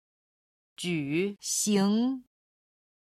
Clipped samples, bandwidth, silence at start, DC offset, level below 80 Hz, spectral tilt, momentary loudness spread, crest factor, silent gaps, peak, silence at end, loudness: under 0.1%; 15.5 kHz; 0.8 s; under 0.1%; -72 dBFS; -4 dB/octave; 9 LU; 16 dB; none; -14 dBFS; 0.8 s; -28 LUFS